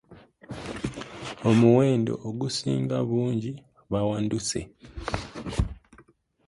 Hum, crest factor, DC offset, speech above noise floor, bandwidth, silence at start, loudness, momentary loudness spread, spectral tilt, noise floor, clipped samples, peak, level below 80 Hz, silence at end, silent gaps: none; 20 dB; under 0.1%; 34 dB; 11.5 kHz; 0.1 s; -26 LUFS; 18 LU; -6 dB/octave; -58 dBFS; under 0.1%; -8 dBFS; -42 dBFS; 0.45 s; none